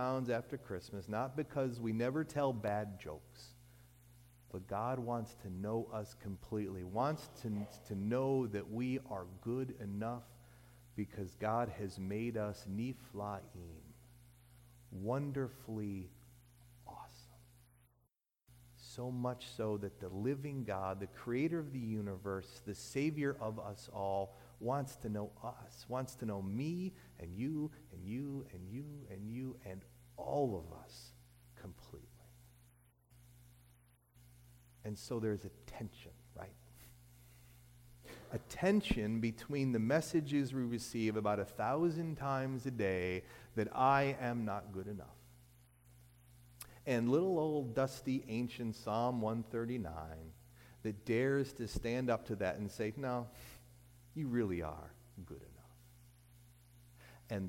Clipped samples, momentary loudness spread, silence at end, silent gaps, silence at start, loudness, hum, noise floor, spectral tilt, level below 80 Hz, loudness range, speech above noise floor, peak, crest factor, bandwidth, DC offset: under 0.1%; 19 LU; 0 s; none; 0 s; -40 LUFS; 60 Hz at -60 dBFS; -81 dBFS; -7 dB/octave; -62 dBFS; 10 LU; 42 dB; -20 dBFS; 22 dB; 17 kHz; under 0.1%